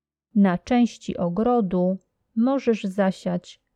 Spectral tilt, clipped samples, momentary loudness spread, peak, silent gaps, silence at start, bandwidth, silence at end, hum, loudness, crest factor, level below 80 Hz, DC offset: -7.5 dB/octave; under 0.1%; 8 LU; -8 dBFS; none; 0.35 s; 9.2 kHz; 0.25 s; none; -23 LUFS; 16 dB; -56 dBFS; under 0.1%